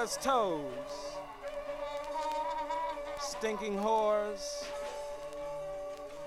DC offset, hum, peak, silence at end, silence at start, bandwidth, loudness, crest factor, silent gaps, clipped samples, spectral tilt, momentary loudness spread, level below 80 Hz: under 0.1%; none; -16 dBFS; 0 s; 0 s; 16 kHz; -36 LUFS; 20 dB; none; under 0.1%; -3 dB/octave; 12 LU; -58 dBFS